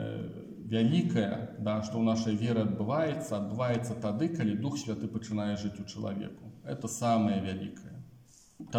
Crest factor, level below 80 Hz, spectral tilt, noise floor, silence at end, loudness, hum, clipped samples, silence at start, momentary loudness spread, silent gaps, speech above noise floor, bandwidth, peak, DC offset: 16 dB; -66 dBFS; -6.5 dB/octave; -58 dBFS; 0 s; -32 LUFS; none; under 0.1%; 0 s; 14 LU; none; 27 dB; 15 kHz; -16 dBFS; under 0.1%